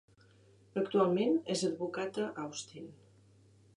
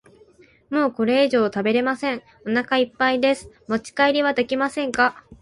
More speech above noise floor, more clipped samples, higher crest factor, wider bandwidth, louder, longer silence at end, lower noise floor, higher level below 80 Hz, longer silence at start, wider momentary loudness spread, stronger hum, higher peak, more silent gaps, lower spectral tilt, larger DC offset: about the same, 30 dB vs 32 dB; neither; about the same, 20 dB vs 18 dB; about the same, 10.5 kHz vs 11.5 kHz; second, -34 LUFS vs -21 LUFS; first, 0.85 s vs 0.1 s; first, -63 dBFS vs -53 dBFS; second, -78 dBFS vs -58 dBFS; about the same, 0.75 s vs 0.7 s; first, 17 LU vs 9 LU; neither; second, -16 dBFS vs -4 dBFS; neither; about the same, -5 dB/octave vs -4.5 dB/octave; neither